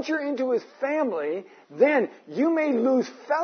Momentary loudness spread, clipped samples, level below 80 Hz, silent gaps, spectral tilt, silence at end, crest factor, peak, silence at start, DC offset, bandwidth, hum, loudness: 10 LU; under 0.1%; -86 dBFS; none; -5.5 dB/octave; 0 s; 16 dB; -8 dBFS; 0 s; under 0.1%; 6.6 kHz; none; -25 LUFS